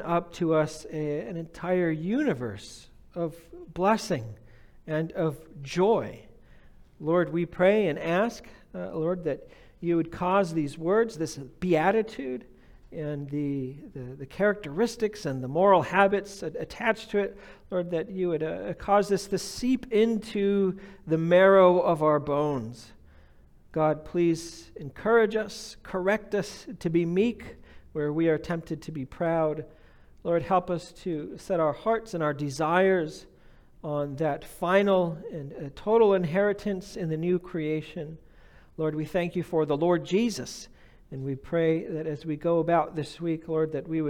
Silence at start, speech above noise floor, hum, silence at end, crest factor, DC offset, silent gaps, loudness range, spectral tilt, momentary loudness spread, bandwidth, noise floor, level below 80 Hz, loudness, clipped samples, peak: 0 s; 28 dB; none; 0 s; 20 dB; under 0.1%; none; 6 LU; -6.5 dB/octave; 15 LU; 17 kHz; -54 dBFS; -56 dBFS; -27 LUFS; under 0.1%; -6 dBFS